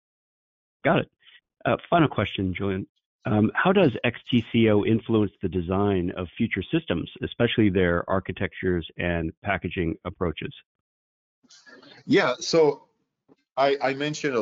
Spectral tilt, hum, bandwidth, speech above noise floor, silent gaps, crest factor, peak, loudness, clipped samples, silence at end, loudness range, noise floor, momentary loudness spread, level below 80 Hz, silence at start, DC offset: -5 dB/octave; none; 7.6 kHz; 40 dB; 2.89-2.95 s, 3.06-3.19 s, 9.37-9.42 s, 10.66-11.42 s; 18 dB; -8 dBFS; -24 LUFS; under 0.1%; 0 s; 6 LU; -64 dBFS; 10 LU; -50 dBFS; 0.85 s; under 0.1%